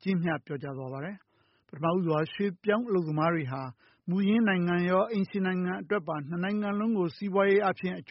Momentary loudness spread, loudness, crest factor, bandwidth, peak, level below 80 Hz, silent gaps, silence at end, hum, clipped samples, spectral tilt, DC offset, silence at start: 12 LU; -29 LUFS; 16 dB; 5.8 kHz; -12 dBFS; -70 dBFS; none; 0.1 s; none; under 0.1%; -6 dB/octave; under 0.1%; 0.05 s